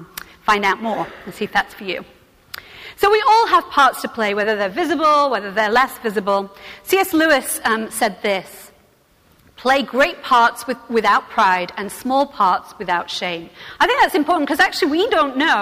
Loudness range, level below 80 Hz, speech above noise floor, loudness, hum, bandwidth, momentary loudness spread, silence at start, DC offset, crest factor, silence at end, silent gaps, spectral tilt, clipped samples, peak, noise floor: 3 LU; -52 dBFS; 37 dB; -17 LUFS; none; 16 kHz; 13 LU; 0 s; under 0.1%; 14 dB; 0 s; none; -3 dB/octave; under 0.1%; -6 dBFS; -55 dBFS